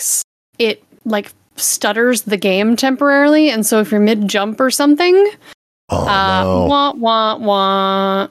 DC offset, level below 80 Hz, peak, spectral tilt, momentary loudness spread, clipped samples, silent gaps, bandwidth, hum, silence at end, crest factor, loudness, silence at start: under 0.1%; -48 dBFS; -2 dBFS; -3.5 dB/octave; 9 LU; under 0.1%; 0.24-0.53 s, 5.54-5.88 s; 15 kHz; none; 0.05 s; 12 dB; -14 LUFS; 0 s